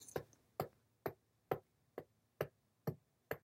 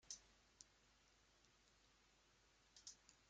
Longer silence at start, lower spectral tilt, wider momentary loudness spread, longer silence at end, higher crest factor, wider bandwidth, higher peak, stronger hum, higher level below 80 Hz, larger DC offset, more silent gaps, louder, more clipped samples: about the same, 0 s vs 0 s; first, -6 dB/octave vs 0 dB/octave; about the same, 11 LU vs 10 LU; about the same, 0.05 s vs 0 s; about the same, 28 dB vs 30 dB; first, 16 kHz vs 9 kHz; first, -22 dBFS vs -38 dBFS; neither; first, -76 dBFS vs -84 dBFS; neither; neither; first, -49 LUFS vs -62 LUFS; neither